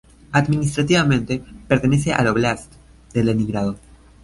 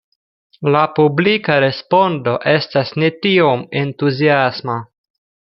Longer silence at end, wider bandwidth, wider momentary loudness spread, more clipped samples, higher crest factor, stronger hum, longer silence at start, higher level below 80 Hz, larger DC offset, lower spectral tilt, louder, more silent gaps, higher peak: second, 0.45 s vs 0.7 s; first, 11.5 kHz vs 6 kHz; first, 10 LU vs 7 LU; neither; about the same, 18 dB vs 14 dB; neither; second, 0.3 s vs 0.6 s; first, -42 dBFS vs -58 dBFS; neither; second, -6 dB/octave vs -8.5 dB/octave; second, -20 LUFS vs -15 LUFS; neither; about the same, -2 dBFS vs -2 dBFS